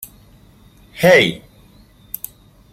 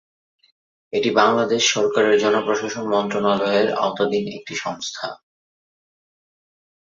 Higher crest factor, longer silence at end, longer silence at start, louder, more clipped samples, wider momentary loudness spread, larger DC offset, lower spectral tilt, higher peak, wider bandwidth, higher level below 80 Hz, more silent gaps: about the same, 18 dB vs 20 dB; second, 1.35 s vs 1.7 s; second, 0 s vs 0.95 s; first, -13 LUFS vs -20 LUFS; neither; first, 24 LU vs 11 LU; neither; about the same, -4.5 dB/octave vs -3.5 dB/octave; about the same, -2 dBFS vs -2 dBFS; first, 16.5 kHz vs 7.6 kHz; first, -50 dBFS vs -64 dBFS; neither